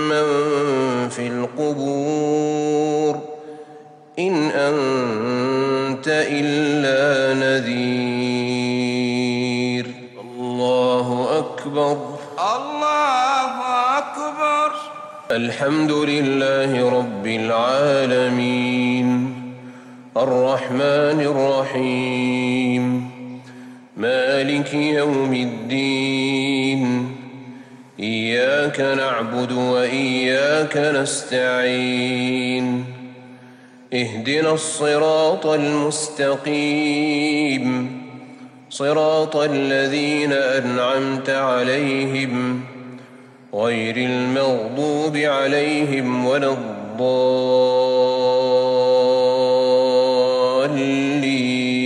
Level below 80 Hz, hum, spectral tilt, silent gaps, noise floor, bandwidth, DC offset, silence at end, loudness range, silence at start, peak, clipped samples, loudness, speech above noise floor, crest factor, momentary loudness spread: -76 dBFS; none; -5 dB/octave; none; -44 dBFS; 11 kHz; under 0.1%; 0 s; 4 LU; 0 s; -6 dBFS; under 0.1%; -19 LUFS; 26 dB; 14 dB; 9 LU